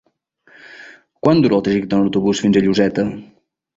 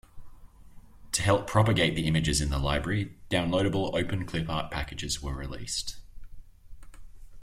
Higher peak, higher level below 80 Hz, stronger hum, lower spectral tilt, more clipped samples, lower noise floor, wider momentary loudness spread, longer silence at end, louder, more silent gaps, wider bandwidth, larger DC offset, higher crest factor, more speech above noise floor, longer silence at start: first, -2 dBFS vs -8 dBFS; second, -50 dBFS vs -42 dBFS; neither; first, -6.5 dB/octave vs -4.5 dB/octave; neither; first, -56 dBFS vs -49 dBFS; first, 16 LU vs 10 LU; first, 0.55 s vs 0 s; first, -16 LUFS vs -28 LUFS; neither; second, 7.8 kHz vs 15.5 kHz; neither; second, 16 dB vs 22 dB; first, 41 dB vs 21 dB; first, 0.7 s vs 0.15 s